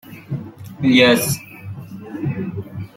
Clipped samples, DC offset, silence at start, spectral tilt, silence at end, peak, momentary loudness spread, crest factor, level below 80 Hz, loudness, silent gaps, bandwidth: under 0.1%; under 0.1%; 0.05 s; -4.5 dB/octave; 0.1 s; -2 dBFS; 22 LU; 20 dB; -54 dBFS; -17 LUFS; none; 16.5 kHz